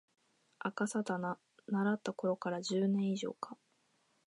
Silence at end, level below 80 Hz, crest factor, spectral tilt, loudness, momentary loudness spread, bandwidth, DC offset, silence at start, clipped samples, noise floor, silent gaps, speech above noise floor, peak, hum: 0.75 s; -88 dBFS; 18 dB; -6 dB/octave; -37 LUFS; 13 LU; 11 kHz; under 0.1%; 0.65 s; under 0.1%; -75 dBFS; none; 40 dB; -20 dBFS; none